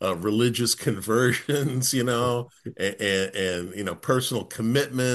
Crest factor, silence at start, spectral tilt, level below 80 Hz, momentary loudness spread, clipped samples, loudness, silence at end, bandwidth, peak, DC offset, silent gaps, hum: 18 dB; 0 s; -4.5 dB/octave; -62 dBFS; 8 LU; under 0.1%; -25 LUFS; 0 s; 13 kHz; -6 dBFS; under 0.1%; none; none